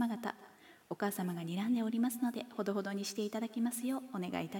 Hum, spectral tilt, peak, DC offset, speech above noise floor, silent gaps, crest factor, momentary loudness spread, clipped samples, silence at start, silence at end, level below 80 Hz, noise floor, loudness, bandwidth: none; -5 dB/octave; -22 dBFS; under 0.1%; 23 dB; none; 16 dB; 6 LU; under 0.1%; 0 s; 0 s; -84 dBFS; -59 dBFS; -37 LUFS; 17.5 kHz